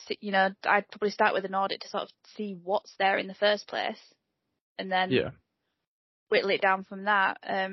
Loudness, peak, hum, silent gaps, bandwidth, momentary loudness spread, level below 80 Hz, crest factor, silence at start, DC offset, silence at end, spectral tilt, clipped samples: -28 LUFS; -8 dBFS; none; 4.61-4.75 s, 5.87-6.26 s; 6.2 kHz; 12 LU; -74 dBFS; 20 dB; 0 s; under 0.1%; 0 s; -1.5 dB/octave; under 0.1%